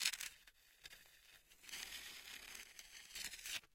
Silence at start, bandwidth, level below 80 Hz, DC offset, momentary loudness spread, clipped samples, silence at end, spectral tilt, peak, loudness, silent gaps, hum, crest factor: 0 s; 17 kHz; -76 dBFS; under 0.1%; 17 LU; under 0.1%; 0.1 s; 2 dB/octave; -20 dBFS; -50 LUFS; none; none; 32 dB